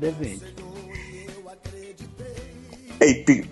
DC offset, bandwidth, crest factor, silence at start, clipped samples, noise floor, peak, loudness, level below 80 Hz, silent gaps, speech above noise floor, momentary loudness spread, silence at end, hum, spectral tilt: under 0.1%; 11.5 kHz; 22 dB; 0 s; under 0.1%; -42 dBFS; -2 dBFS; -20 LUFS; -48 dBFS; none; 22 dB; 23 LU; 0 s; none; -5 dB/octave